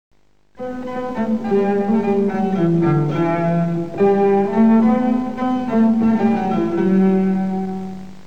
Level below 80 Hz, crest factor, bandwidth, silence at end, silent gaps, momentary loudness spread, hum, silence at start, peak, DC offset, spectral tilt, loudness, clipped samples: -50 dBFS; 12 dB; 7 kHz; 0.1 s; none; 11 LU; 50 Hz at -40 dBFS; 0.1 s; -4 dBFS; 2%; -9.5 dB/octave; -17 LUFS; under 0.1%